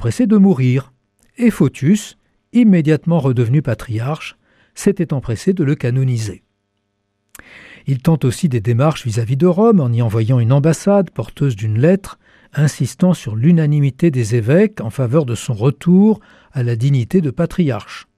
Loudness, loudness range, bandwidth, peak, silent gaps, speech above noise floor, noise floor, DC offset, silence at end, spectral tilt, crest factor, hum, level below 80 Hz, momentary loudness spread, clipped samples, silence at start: -15 LUFS; 5 LU; 14 kHz; -2 dBFS; none; 54 dB; -69 dBFS; under 0.1%; 0.15 s; -7.5 dB/octave; 14 dB; none; -46 dBFS; 9 LU; under 0.1%; 0 s